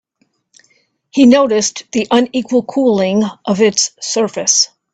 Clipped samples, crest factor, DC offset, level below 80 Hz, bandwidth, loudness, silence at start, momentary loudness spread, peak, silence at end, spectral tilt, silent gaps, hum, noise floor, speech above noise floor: under 0.1%; 14 dB; under 0.1%; -58 dBFS; 9.2 kHz; -13 LUFS; 1.15 s; 8 LU; 0 dBFS; 0.25 s; -3 dB/octave; none; none; -63 dBFS; 50 dB